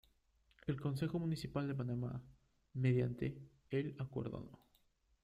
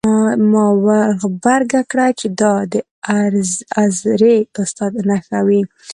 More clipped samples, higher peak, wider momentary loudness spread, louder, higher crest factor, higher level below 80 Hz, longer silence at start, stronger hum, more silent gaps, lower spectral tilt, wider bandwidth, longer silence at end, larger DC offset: neither; second, -22 dBFS vs 0 dBFS; first, 14 LU vs 7 LU; second, -41 LUFS vs -15 LUFS; about the same, 18 dB vs 14 dB; second, -66 dBFS vs -58 dBFS; first, 0.65 s vs 0.05 s; neither; second, none vs 2.91-3.02 s; first, -8.5 dB/octave vs -5.5 dB/octave; about the same, 12.5 kHz vs 11.5 kHz; first, 0.7 s vs 0 s; neither